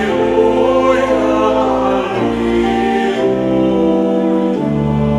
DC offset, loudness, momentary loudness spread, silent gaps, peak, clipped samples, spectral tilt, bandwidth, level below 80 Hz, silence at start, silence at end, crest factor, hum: under 0.1%; -14 LUFS; 3 LU; none; 0 dBFS; under 0.1%; -7 dB/octave; 11 kHz; -36 dBFS; 0 s; 0 s; 12 dB; none